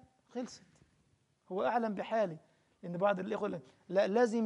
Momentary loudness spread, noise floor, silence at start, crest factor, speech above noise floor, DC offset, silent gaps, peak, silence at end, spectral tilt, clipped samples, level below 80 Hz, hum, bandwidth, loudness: 16 LU; -73 dBFS; 0.35 s; 18 dB; 40 dB; under 0.1%; none; -18 dBFS; 0 s; -6.5 dB/octave; under 0.1%; -80 dBFS; none; 11 kHz; -35 LUFS